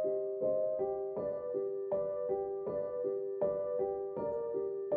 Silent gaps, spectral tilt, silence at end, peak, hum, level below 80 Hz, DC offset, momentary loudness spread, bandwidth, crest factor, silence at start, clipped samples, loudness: none; -10 dB/octave; 0 s; -22 dBFS; none; -70 dBFS; under 0.1%; 4 LU; 2.5 kHz; 12 dB; 0 s; under 0.1%; -36 LUFS